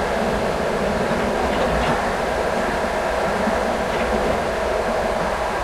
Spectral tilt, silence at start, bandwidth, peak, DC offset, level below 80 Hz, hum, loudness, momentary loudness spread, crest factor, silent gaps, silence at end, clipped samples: -5 dB/octave; 0 s; 16 kHz; -8 dBFS; under 0.1%; -34 dBFS; none; -21 LUFS; 2 LU; 14 dB; none; 0 s; under 0.1%